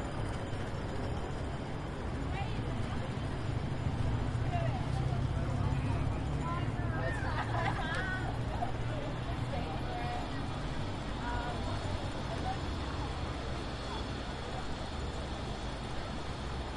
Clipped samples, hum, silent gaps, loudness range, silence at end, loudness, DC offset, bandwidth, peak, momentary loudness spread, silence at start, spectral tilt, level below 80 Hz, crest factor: under 0.1%; none; none; 4 LU; 0 s; -37 LUFS; under 0.1%; 11.5 kHz; -20 dBFS; 6 LU; 0 s; -6.5 dB/octave; -42 dBFS; 16 dB